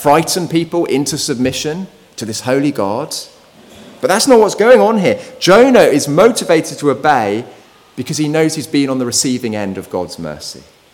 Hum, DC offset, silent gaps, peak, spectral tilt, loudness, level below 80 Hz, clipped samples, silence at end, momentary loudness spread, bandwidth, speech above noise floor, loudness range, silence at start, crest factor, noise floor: none; under 0.1%; none; 0 dBFS; -4 dB/octave; -13 LUFS; -52 dBFS; 0.3%; 0.4 s; 16 LU; 18.5 kHz; 27 dB; 7 LU; 0 s; 14 dB; -40 dBFS